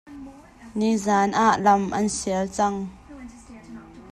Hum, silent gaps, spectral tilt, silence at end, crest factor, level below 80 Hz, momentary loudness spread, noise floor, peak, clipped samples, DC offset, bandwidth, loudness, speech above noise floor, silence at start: none; none; -4.5 dB/octave; 0 s; 18 dB; -52 dBFS; 24 LU; -44 dBFS; -6 dBFS; under 0.1%; under 0.1%; 12.5 kHz; -22 LUFS; 22 dB; 0.05 s